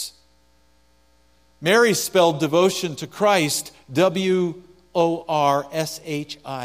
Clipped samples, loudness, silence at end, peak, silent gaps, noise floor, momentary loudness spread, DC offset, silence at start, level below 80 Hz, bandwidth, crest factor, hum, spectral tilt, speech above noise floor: under 0.1%; -21 LUFS; 0 s; -4 dBFS; none; -60 dBFS; 12 LU; under 0.1%; 0 s; -62 dBFS; 15.5 kHz; 18 dB; none; -4 dB/octave; 40 dB